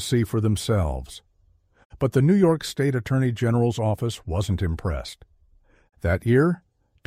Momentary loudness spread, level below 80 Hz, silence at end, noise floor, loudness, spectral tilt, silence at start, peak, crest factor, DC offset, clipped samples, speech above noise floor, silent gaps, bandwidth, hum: 13 LU; -40 dBFS; 0.5 s; -61 dBFS; -23 LUFS; -7 dB/octave; 0 s; -8 dBFS; 16 dB; under 0.1%; under 0.1%; 39 dB; 1.85-1.90 s; 15.5 kHz; none